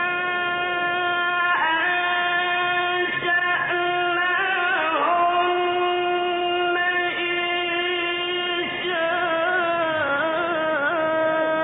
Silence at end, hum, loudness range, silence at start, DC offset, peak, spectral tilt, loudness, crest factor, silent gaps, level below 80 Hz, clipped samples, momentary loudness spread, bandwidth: 0 s; none; 2 LU; 0 s; under 0.1%; -10 dBFS; -8 dB/octave; -21 LUFS; 12 dB; none; -62 dBFS; under 0.1%; 3 LU; 4 kHz